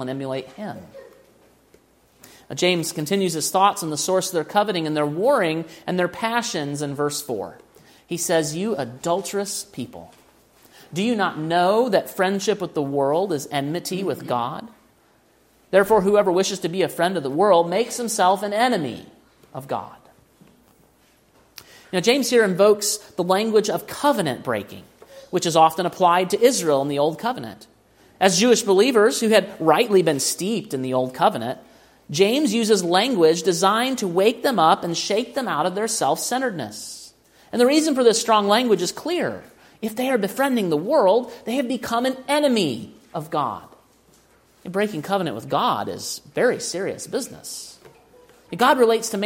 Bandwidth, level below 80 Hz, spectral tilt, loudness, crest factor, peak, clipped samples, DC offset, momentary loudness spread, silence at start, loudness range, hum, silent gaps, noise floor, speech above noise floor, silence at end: 16.5 kHz; -64 dBFS; -4 dB/octave; -21 LUFS; 20 dB; -2 dBFS; under 0.1%; under 0.1%; 13 LU; 0 s; 7 LU; none; none; -58 dBFS; 38 dB; 0 s